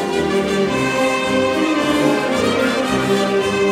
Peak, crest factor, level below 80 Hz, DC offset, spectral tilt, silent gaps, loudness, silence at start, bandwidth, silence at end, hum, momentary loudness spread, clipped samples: -4 dBFS; 12 dB; -44 dBFS; under 0.1%; -4.5 dB/octave; none; -17 LUFS; 0 s; 16 kHz; 0 s; none; 2 LU; under 0.1%